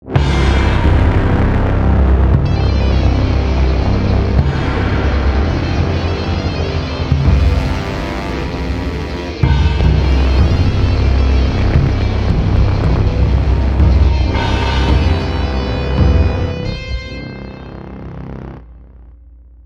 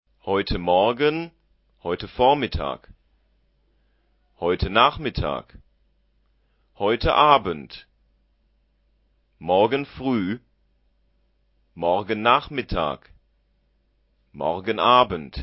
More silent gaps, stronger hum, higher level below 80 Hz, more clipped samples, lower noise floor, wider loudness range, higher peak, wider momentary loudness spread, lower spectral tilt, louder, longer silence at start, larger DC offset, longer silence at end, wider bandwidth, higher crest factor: neither; neither; first, -16 dBFS vs -42 dBFS; neither; second, -39 dBFS vs -66 dBFS; about the same, 4 LU vs 4 LU; about the same, 0 dBFS vs 0 dBFS; second, 10 LU vs 16 LU; second, -7.5 dB/octave vs -9.5 dB/octave; first, -15 LUFS vs -22 LUFS; second, 0.05 s vs 0.25 s; neither; first, 0.5 s vs 0 s; first, 7 kHz vs 5.8 kHz; second, 14 dB vs 24 dB